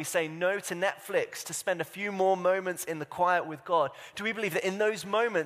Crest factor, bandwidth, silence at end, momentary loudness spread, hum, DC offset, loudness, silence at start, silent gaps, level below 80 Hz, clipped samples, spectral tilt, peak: 16 dB; 15.5 kHz; 0 s; 6 LU; none; under 0.1%; -30 LUFS; 0 s; none; -76 dBFS; under 0.1%; -3.5 dB/octave; -14 dBFS